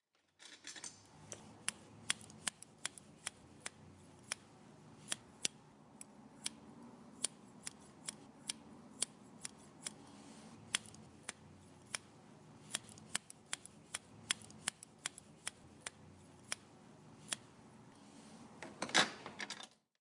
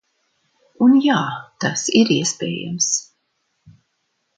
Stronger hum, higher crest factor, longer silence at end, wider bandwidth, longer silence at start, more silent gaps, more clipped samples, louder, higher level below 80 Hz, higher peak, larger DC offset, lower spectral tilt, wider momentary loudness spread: neither; first, 34 dB vs 20 dB; second, 0.25 s vs 1.35 s; first, 11.5 kHz vs 9.4 kHz; second, 0.4 s vs 0.8 s; neither; neither; second, -44 LUFS vs -18 LUFS; second, -82 dBFS vs -66 dBFS; second, -14 dBFS vs 0 dBFS; neither; second, -1 dB/octave vs -3.5 dB/octave; first, 19 LU vs 11 LU